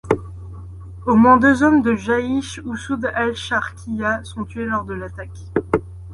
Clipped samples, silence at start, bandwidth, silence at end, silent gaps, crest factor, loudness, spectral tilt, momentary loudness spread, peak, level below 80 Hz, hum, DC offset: under 0.1%; 0.05 s; 11.5 kHz; 0 s; none; 18 dB; -19 LUFS; -6 dB/octave; 21 LU; -2 dBFS; -40 dBFS; none; under 0.1%